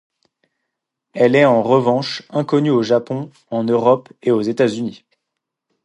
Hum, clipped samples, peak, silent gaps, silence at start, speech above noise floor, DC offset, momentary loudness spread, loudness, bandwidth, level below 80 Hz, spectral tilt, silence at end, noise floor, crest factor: none; under 0.1%; 0 dBFS; none; 1.15 s; 63 dB; under 0.1%; 13 LU; -17 LUFS; 11 kHz; -66 dBFS; -7 dB/octave; 0.9 s; -79 dBFS; 18 dB